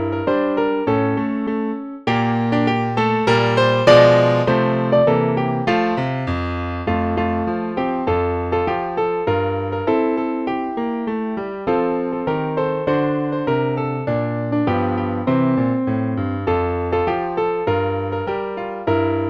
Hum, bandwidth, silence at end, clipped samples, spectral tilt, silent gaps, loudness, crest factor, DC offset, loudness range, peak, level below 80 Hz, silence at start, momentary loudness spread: none; 9.6 kHz; 0 s; under 0.1%; -7.5 dB/octave; none; -19 LUFS; 18 dB; under 0.1%; 6 LU; 0 dBFS; -44 dBFS; 0 s; 7 LU